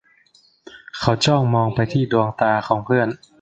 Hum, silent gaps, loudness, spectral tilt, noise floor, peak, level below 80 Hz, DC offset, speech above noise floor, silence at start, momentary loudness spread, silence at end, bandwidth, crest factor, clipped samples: none; none; -19 LUFS; -6 dB/octave; -56 dBFS; 0 dBFS; -50 dBFS; under 0.1%; 38 dB; 0.75 s; 6 LU; 0.25 s; 9 kHz; 20 dB; under 0.1%